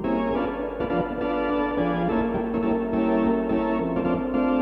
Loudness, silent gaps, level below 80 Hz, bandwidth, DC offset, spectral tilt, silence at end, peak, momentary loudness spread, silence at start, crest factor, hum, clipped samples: -25 LUFS; none; -42 dBFS; 5.2 kHz; under 0.1%; -9.5 dB/octave; 0 s; -10 dBFS; 4 LU; 0 s; 12 dB; none; under 0.1%